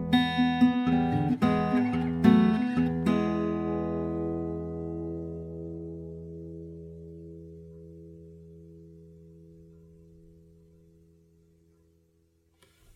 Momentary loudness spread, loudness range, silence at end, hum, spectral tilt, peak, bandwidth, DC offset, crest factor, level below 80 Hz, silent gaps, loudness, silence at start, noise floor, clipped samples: 24 LU; 24 LU; 3.35 s; none; -8 dB/octave; -8 dBFS; 9.8 kHz; under 0.1%; 22 dB; -52 dBFS; none; -27 LUFS; 0 s; -68 dBFS; under 0.1%